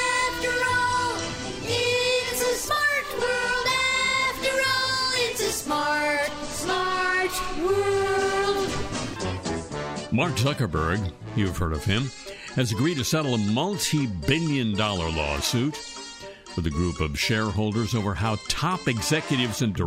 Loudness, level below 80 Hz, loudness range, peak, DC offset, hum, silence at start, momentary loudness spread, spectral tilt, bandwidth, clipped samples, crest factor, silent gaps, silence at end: -25 LUFS; -42 dBFS; 4 LU; -8 dBFS; under 0.1%; none; 0 s; 8 LU; -4 dB/octave; 16 kHz; under 0.1%; 16 dB; none; 0 s